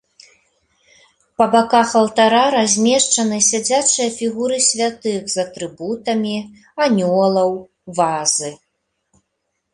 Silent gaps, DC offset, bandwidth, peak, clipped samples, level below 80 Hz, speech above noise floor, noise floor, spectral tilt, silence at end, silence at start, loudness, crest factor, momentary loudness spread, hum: none; under 0.1%; 11.5 kHz; -2 dBFS; under 0.1%; -60 dBFS; 57 dB; -73 dBFS; -2.5 dB/octave; 1.2 s; 1.4 s; -16 LUFS; 16 dB; 12 LU; none